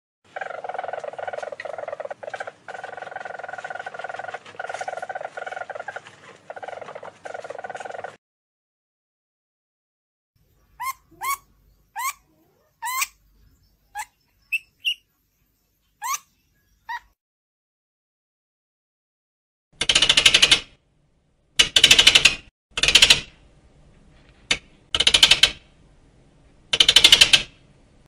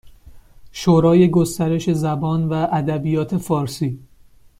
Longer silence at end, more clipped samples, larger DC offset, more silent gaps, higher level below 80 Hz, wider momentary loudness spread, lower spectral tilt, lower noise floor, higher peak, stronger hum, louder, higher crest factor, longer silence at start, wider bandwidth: about the same, 0.6 s vs 0.6 s; neither; neither; first, 8.18-10.34 s, 17.21-19.71 s, 22.51-22.70 s vs none; about the same, -48 dBFS vs -48 dBFS; first, 24 LU vs 11 LU; second, 0.5 dB/octave vs -7.5 dB/octave; first, -68 dBFS vs -48 dBFS; about the same, 0 dBFS vs -2 dBFS; neither; about the same, -16 LUFS vs -18 LUFS; first, 24 dB vs 16 dB; first, 0.35 s vs 0.05 s; about the same, 16 kHz vs 15 kHz